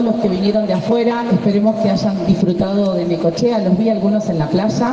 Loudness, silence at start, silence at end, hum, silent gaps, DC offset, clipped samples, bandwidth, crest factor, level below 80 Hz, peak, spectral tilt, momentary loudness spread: -16 LUFS; 0 s; 0 s; none; none; under 0.1%; under 0.1%; 7.6 kHz; 12 dB; -46 dBFS; -2 dBFS; -7.5 dB/octave; 2 LU